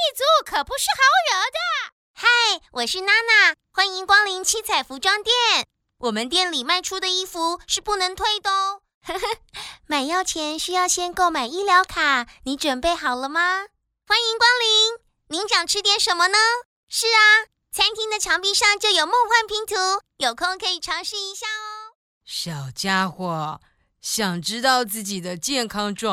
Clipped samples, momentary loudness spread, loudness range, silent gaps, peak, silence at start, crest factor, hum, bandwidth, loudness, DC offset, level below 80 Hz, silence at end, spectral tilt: under 0.1%; 12 LU; 7 LU; 1.92-2.14 s, 8.94-9.01 s, 16.65-16.87 s, 21.95-22.21 s; -2 dBFS; 0 s; 18 dB; none; 16 kHz; -20 LUFS; under 0.1%; -54 dBFS; 0 s; -1 dB/octave